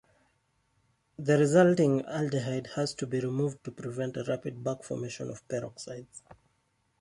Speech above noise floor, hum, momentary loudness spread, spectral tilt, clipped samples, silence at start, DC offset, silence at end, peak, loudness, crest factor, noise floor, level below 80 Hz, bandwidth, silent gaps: 44 dB; none; 18 LU; -6.5 dB/octave; under 0.1%; 1.2 s; under 0.1%; 0.7 s; -10 dBFS; -30 LUFS; 20 dB; -74 dBFS; -68 dBFS; 11.5 kHz; none